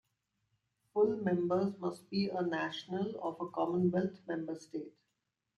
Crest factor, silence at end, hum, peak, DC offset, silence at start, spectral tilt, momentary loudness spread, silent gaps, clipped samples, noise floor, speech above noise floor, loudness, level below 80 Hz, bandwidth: 16 dB; 0.7 s; none; -20 dBFS; under 0.1%; 0.95 s; -7.5 dB/octave; 10 LU; none; under 0.1%; -85 dBFS; 51 dB; -35 LUFS; -76 dBFS; 11.5 kHz